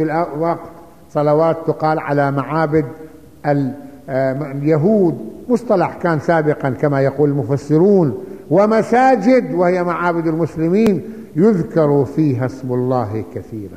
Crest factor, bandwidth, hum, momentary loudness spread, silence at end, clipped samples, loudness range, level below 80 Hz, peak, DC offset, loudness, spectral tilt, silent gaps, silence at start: 14 dB; 15 kHz; none; 11 LU; 0 s; under 0.1%; 4 LU; -52 dBFS; -2 dBFS; 0.4%; -16 LUFS; -8.5 dB/octave; none; 0 s